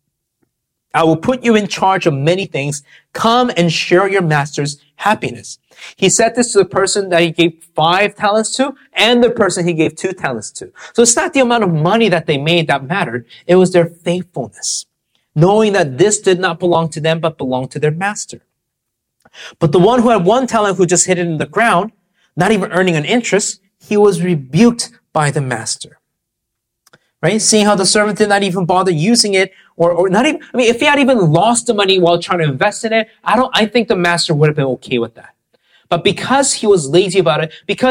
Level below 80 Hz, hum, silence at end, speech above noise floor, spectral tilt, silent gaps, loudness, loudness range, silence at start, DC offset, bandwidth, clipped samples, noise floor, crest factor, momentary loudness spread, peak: -52 dBFS; none; 0 s; 62 dB; -4 dB/octave; none; -13 LUFS; 3 LU; 0.95 s; under 0.1%; 16.5 kHz; under 0.1%; -75 dBFS; 14 dB; 9 LU; 0 dBFS